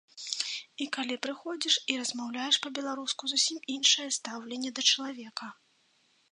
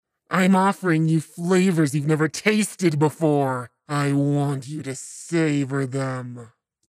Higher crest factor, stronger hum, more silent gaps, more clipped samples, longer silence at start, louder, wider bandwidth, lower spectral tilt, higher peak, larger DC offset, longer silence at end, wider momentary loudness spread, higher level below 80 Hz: first, 24 dB vs 18 dB; neither; neither; neither; second, 0.15 s vs 0.3 s; second, -29 LUFS vs -22 LUFS; second, 11 kHz vs 15 kHz; second, 0.5 dB/octave vs -6 dB/octave; second, -8 dBFS vs -4 dBFS; neither; first, 0.8 s vs 0.45 s; about the same, 13 LU vs 12 LU; second, -88 dBFS vs -72 dBFS